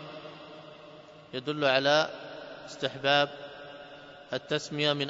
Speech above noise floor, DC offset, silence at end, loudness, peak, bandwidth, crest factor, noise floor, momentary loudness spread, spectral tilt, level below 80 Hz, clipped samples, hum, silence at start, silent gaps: 22 dB; under 0.1%; 0 s; -28 LUFS; -10 dBFS; 8 kHz; 22 dB; -50 dBFS; 23 LU; -4 dB/octave; -74 dBFS; under 0.1%; none; 0 s; none